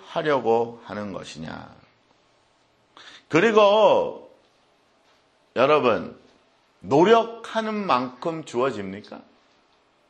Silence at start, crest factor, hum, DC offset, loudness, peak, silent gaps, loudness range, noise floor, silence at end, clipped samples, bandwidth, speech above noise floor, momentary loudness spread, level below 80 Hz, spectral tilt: 0.05 s; 22 dB; none; under 0.1%; -21 LUFS; -2 dBFS; none; 4 LU; -63 dBFS; 0.9 s; under 0.1%; 9.2 kHz; 41 dB; 21 LU; -66 dBFS; -5.5 dB/octave